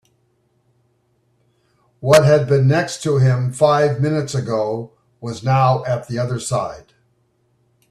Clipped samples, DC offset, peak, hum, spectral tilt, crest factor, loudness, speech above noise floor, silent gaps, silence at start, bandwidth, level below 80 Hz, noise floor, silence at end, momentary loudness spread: under 0.1%; under 0.1%; 0 dBFS; none; -6 dB/octave; 18 dB; -17 LUFS; 47 dB; none; 2 s; 13.5 kHz; -54 dBFS; -63 dBFS; 1.1 s; 13 LU